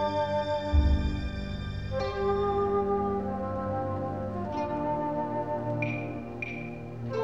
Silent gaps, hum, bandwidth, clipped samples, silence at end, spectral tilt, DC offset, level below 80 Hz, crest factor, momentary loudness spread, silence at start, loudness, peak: none; none; 7.6 kHz; under 0.1%; 0 s; -8 dB/octave; 0.3%; -36 dBFS; 16 dB; 8 LU; 0 s; -31 LUFS; -12 dBFS